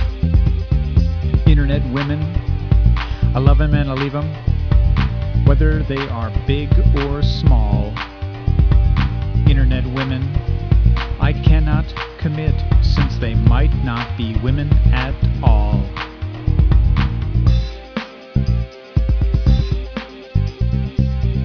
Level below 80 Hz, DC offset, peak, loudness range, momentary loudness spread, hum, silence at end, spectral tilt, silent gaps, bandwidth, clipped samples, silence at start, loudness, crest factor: -18 dBFS; under 0.1%; 0 dBFS; 2 LU; 8 LU; none; 0 s; -8.5 dB/octave; none; 5.4 kHz; under 0.1%; 0 s; -18 LUFS; 16 dB